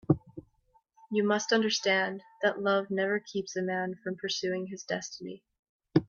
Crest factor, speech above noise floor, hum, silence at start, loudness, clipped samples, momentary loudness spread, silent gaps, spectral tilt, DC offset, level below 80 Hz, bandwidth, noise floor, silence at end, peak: 22 dB; 38 dB; none; 0.1 s; -30 LUFS; under 0.1%; 14 LU; 5.59-5.63 s, 5.69-5.79 s; -4.5 dB/octave; under 0.1%; -64 dBFS; 7.2 kHz; -69 dBFS; 0.05 s; -8 dBFS